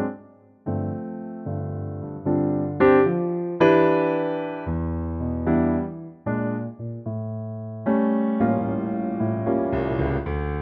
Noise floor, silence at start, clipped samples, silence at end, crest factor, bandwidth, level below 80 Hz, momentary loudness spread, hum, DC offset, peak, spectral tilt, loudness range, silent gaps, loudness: -50 dBFS; 0 s; under 0.1%; 0 s; 18 dB; 6 kHz; -40 dBFS; 14 LU; none; under 0.1%; -4 dBFS; -10 dB/octave; 5 LU; none; -24 LUFS